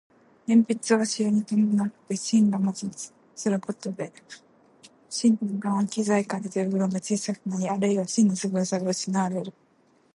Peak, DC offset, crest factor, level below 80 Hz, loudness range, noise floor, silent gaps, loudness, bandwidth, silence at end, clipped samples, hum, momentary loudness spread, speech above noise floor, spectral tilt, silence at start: -8 dBFS; under 0.1%; 18 dB; -74 dBFS; 4 LU; -63 dBFS; none; -25 LUFS; 11.5 kHz; 0.65 s; under 0.1%; none; 12 LU; 38 dB; -5.5 dB/octave; 0.5 s